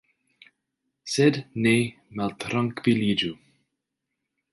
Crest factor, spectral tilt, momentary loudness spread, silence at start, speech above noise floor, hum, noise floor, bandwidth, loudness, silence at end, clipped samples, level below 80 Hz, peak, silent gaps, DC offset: 20 dB; -5.5 dB/octave; 10 LU; 1.05 s; 59 dB; none; -83 dBFS; 11.5 kHz; -25 LUFS; 1.2 s; under 0.1%; -62 dBFS; -8 dBFS; none; under 0.1%